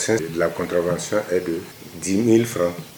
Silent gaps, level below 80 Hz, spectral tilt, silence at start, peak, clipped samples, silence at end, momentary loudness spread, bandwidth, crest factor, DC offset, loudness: none; -60 dBFS; -5 dB/octave; 0 s; -4 dBFS; under 0.1%; 0 s; 12 LU; over 20 kHz; 18 dB; under 0.1%; -22 LUFS